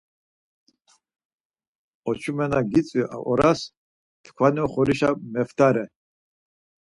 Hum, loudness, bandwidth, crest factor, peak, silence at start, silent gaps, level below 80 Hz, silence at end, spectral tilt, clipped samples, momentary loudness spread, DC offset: none; -23 LUFS; 11.5 kHz; 20 dB; -4 dBFS; 2.05 s; 3.77-4.24 s; -54 dBFS; 1 s; -7 dB/octave; under 0.1%; 9 LU; under 0.1%